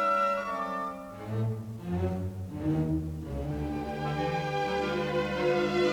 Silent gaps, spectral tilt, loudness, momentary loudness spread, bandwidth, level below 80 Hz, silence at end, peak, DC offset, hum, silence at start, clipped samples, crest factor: none; -7 dB/octave; -31 LUFS; 9 LU; over 20 kHz; -48 dBFS; 0 s; -16 dBFS; under 0.1%; none; 0 s; under 0.1%; 14 dB